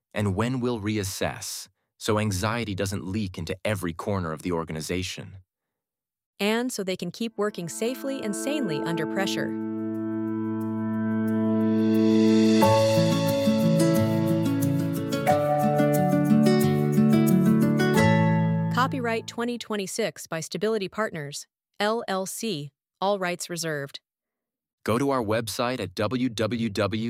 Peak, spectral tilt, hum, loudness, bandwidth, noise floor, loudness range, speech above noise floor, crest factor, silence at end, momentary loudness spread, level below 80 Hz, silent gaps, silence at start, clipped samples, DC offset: -8 dBFS; -6 dB/octave; none; -25 LUFS; 16.5 kHz; under -90 dBFS; 9 LU; over 62 dB; 18 dB; 0 s; 11 LU; -60 dBFS; 6.26-6.33 s, 24.73-24.78 s; 0.15 s; under 0.1%; under 0.1%